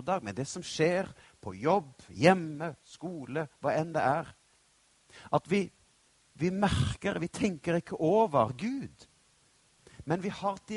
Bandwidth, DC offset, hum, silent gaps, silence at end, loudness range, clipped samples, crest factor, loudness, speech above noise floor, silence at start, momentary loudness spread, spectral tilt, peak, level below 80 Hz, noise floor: 11.5 kHz; under 0.1%; none; none; 0 s; 3 LU; under 0.1%; 24 dB; -31 LUFS; 36 dB; 0 s; 16 LU; -6 dB/octave; -8 dBFS; -56 dBFS; -67 dBFS